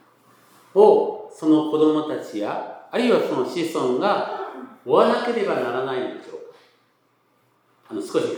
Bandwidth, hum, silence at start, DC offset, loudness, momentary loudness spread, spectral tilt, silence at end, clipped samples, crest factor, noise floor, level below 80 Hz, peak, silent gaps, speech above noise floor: 18.5 kHz; none; 0.75 s; under 0.1%; -21 LUFS; 16 LU; -5.5 dB/octave; 0 s; under 0.1%; 22 dB; -64 dBFS; -84 dBFS; 0 dBFS; none; 44 dB